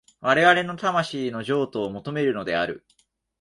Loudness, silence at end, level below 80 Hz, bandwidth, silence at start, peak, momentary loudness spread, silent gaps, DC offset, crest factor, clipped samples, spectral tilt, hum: -23 LUFS; 0.6 s; -62 dBFS; 11.5 kHz; 0.2 s; -4 dBFS; 12 LU; none; under 0.1%; 20 dB; under 0.1%; -5 dB/octave; none